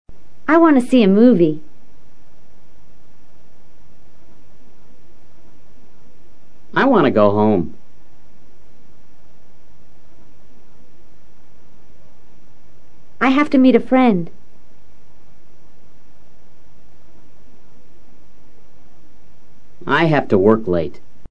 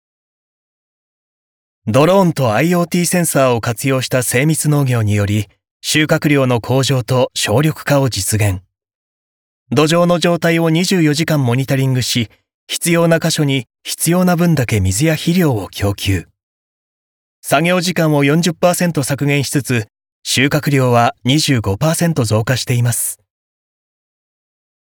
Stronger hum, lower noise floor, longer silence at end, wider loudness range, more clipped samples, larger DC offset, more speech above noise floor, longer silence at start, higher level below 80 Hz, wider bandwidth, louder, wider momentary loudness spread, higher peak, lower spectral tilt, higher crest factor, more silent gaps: neither; second, -53 dBFS vs under -90 dBFS; second, 0 s vs 1.75 s; first, 9 LU vs 2 LU; neither; first, 7% vs under 0.1%; second, 40 dB vs over 76 dB; second, 0.05 s vs 1.85 s; about the same, -52 dBFS vs -52 dBFS; second, 10.5 kHz vs over 20 kHz; about the same, -14 LUFS vs -15 LUFS; first, 14 LU vs 6 LU; about the same, 0 dBFS vs -2 dBFS; first, -8 dB/octave vs -5 dB/octave; first, 20 dB vs 14 dB; second, none vs 5.71-5.80 s, 8.95-9.66 s, 12.54-12.67 s, 16.43-17.43 s, 20.12-20.22 s